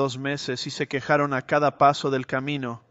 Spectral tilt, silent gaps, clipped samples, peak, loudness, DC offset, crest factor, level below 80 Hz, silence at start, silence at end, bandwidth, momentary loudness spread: -5 dB/octave; none; under 0.1%; -4 dBFS; -24 LUFS; under 0.1%; 20 dB; -64 dBFS; 0 s; 0.1 s; 8.2 kHz; 9 LU